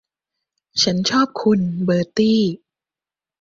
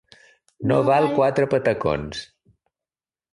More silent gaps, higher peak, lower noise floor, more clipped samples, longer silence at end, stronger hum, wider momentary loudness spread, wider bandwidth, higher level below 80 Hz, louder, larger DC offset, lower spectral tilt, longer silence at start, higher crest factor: neither; first, -2 dBFS vs -6 dBFS; about the same, under -90 dBFS vs under -90 dBFS; neither; second, 0.85 s vs 1.1 s; neither; second, 6 LU vs 12 LU; second, 7.6 kHz vs 11.5 kHz; second, -58 dBFS vs -50 dBFS; first, -18 LUFS vs -21 LUFS; neither; second, -5 dB/octave vs -7 dB/octave; first, 0.75 s vs 0.6 s; about the same, 18 dB vs 16 dB